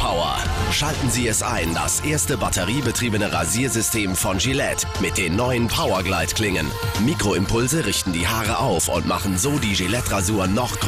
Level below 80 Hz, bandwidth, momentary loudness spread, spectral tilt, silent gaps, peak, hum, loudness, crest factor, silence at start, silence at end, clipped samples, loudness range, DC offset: -34 dBFS; 15.5 kHz; 2 LU; -3.5 dB/octave; none; -10 dBFS; none; -20 LUFS; 12 dB; 0 s; 0 s; under 0.1%; 0 LU; under 0.1%